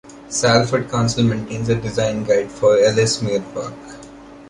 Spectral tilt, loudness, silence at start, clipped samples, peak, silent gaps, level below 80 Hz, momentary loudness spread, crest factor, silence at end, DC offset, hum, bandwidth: -5 dB/octave; -18 LUFS; 0.05 s; under 0.1%; -2 dBFS; none; -46 dBFS; 15 LU; 18 dB; 0 s; under 0.1%; none; 11.5 kHz